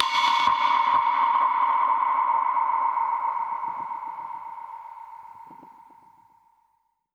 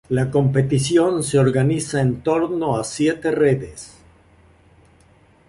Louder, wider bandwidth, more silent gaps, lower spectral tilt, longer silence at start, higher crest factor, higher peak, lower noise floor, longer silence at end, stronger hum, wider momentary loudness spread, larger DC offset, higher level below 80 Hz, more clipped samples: second, -23 LUFS vs -19 LUFS; about the same, 10.5 kHz vs 11.5 kHz; neither; second, -1 dB/octave vs -6 dB/octave; about the same, 0 s vs 0.1 s; first, 22 dB vs 16 dB; about the same, -2 dBFS vs -4 dBFS; first, -70 dBFS vs -53 dBFS; about the same, 1.5 s vs 1.6 s; neither; first, 20 LU vs 6 LU; neither; second, -74 dBFS vs -48 dBFS; neither